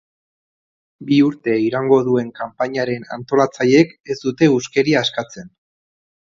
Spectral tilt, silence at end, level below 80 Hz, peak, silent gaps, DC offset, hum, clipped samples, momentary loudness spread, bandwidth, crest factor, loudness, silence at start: -6 dB/octave; 0.95 s; -60 dBFS; 0 dBFS; 4.00-4.04 s; under 0.1%; none; under 0.1%; 13 LU; 7.6 kHz; 18 dB; -17 LUFS; 1 s